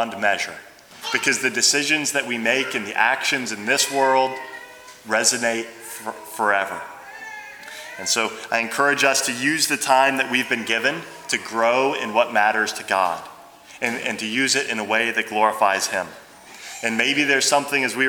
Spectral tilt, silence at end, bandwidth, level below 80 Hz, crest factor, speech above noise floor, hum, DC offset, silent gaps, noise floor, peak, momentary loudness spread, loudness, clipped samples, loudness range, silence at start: -1.5 dB/octave; 0 s; over 20 kHz; -70 dBFS; 20 dB; 23 dB; none; under 0.1%; none; -44 dBFS; -2 dBFS; 17 LU; -20 LUFS; under 0.1%; 5 LU; 0 s